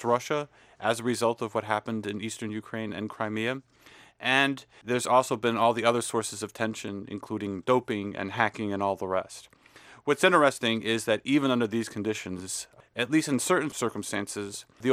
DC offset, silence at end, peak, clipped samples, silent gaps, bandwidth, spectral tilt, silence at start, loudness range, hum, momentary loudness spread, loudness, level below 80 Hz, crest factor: under 0.1%; 0 s; -6 dBFS; under 0.1%; none; 16 kHz; -4 dB/octave; 0 s; 4 LU; none; 12 LU; -28 LUFS; -70 dBFS; 22 dB